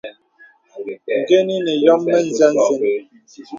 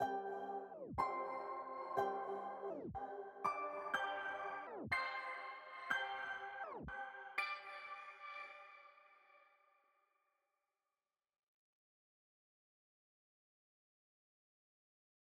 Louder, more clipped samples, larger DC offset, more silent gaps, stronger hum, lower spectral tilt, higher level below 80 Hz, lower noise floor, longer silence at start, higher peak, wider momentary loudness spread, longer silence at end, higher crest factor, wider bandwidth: first, -16 LUFS vs -45 LUFS; neither; neither; neither; neither; about the same, -4.5 dB/octave vs -4.5 dB/octave; first, -68 dBFS vs -74 dBFS; second, -50 dBFS vs under -90 dBFS; about the same, 0.05 s vs 0 s; first, 0 dBFS vs -24 dBFS; first, 16 LU vs 10 LU; second, 0 s vs 5.9 s; second, 18 dB vs 24 dB; second, 7.6 kHz vs 12 kHz